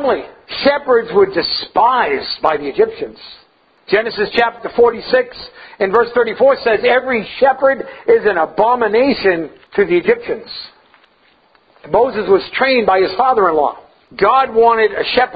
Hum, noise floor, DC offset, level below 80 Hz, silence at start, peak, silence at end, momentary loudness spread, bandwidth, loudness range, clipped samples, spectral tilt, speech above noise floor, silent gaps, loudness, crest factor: none; -53 dBFS; under 0.1%; -50 dBFS; 0 s; 0 dBFS; 0 s; 9 LU; 5 kHz; 4 LU; under 0.1%; -7 dB/octave; 39 dB; none; -14 LUFS; 14 dB